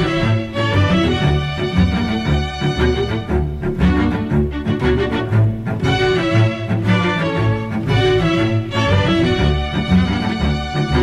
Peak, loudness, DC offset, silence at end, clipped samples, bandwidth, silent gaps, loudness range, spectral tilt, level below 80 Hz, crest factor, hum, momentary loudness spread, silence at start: -4 dBFS; -17 LUFS; under 0.1%; 0 s; under 0.1%; 10.5 kHz; none; 2 LU; -7 dB/octave; -26 dBFS; 12 dB; none; 5 LU; 0 s